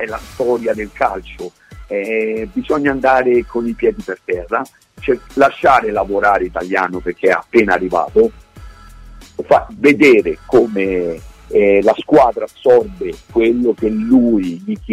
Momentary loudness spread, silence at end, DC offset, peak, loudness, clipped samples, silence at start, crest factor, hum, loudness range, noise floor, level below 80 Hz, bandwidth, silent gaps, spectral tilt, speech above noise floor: 13 LU; 0 s; under 0.1%; 0 dBFS; -15 LUFS; under 0.1%; 0 s; 14 dB; none; 4 LU; -37 dBFS; -40 dBFS; 14 kHz; none; -6.5 dB/octave; 23 dB